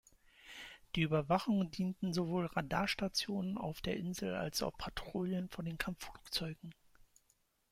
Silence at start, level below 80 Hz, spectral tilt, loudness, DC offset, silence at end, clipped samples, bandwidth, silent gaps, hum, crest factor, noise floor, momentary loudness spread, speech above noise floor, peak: 0.4 s; -60 dBFS; -5 dB/octave; -38 LUFS; under 0.1%; 1 s; under 0.1%; 16 kHz; none; none; 20 dB; -76 dBFS; 13 LU; 39 dB; -18 dBFS